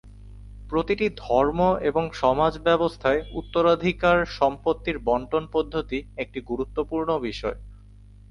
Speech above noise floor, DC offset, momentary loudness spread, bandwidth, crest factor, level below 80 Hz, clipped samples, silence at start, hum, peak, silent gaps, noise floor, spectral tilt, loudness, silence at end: 24 dB; under 0.1%; 9 LU; 10.5 kHz; 18 dB; -42 dBFS; under 0.1%; 0.05 s; 50 Hz at -45 dBFS; -6 dBFS; none; -48 dBFS; -6.5 dB/octave; -24 LUFS; 0.55 s